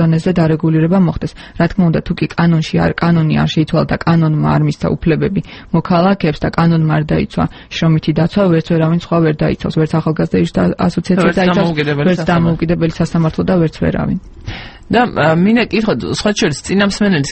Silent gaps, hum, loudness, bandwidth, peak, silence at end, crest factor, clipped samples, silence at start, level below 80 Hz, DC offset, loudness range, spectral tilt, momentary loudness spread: none; none; -14 LUFS; 8.6 kHz; 0 dBFS; 0 s; 14 dB; under 0.1%; 0 s; -34 dBFS; under 0.1%; 1 LU; -7 dB/octave; 6 LU